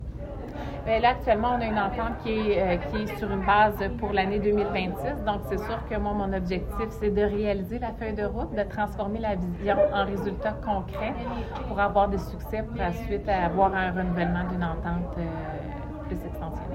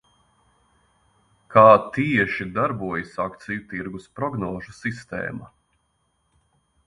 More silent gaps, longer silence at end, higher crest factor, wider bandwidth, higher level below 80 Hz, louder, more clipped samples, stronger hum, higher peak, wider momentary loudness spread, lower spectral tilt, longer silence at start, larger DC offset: neither; second, 0 s vs 1.4 s; second, 18 dB vs 24 dB; first, 16 kHz vs 10.5 kHz; first, -38 dBFS vs -56 dBFS; second, -27 LUFS vs -22 LUFS; neither; neither; second, -8 dBFS vs 0 dBFS; second, 10 LU vs 18 LU; about the same, -7.5 dB/octave vs -7.5 dB/octave; second, 0 s vs 1.5 s; neither